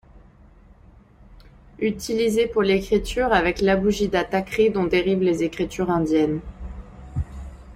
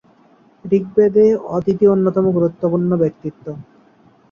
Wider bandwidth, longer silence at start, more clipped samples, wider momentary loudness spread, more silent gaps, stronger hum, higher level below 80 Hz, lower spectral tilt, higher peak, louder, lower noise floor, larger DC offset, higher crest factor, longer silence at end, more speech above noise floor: first, 16 kHz vs 6.8 kHz; second, 0.15 s vs 0.65 s; neither; second, 14 LU vs 18 LU; neither; neither; first, -40 dBFS vs -54 dBFS; second, -6 dB/octave vs -10.5 dB/octave; about the same, -4 dBFS vs -2 dBFS; second, -22 LUFS vs -16 LUFS; about the same, -50 dBFS vs -51 dBFS; neither; first, 20 dB vs 14 dB; second, 0 s vs 0.7 s; second, 29 dB vs 36 dB